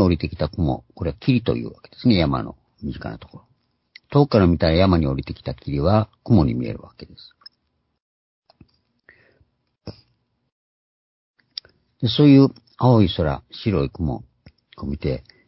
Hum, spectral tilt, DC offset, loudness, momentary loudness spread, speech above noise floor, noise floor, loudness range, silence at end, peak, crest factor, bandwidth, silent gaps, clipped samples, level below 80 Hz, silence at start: none; -11.5 dB/octave; under 0.1%; -20 LUFS; 19 LU; 52 dB; -71 dBFS; 6 LU; 0.3 s; -2 dBFS; 20 dB; 5.8 kHz; 8.02-8.43 s, 10.52-11.34 s; under 0.1%; -36 dBFS; 0 s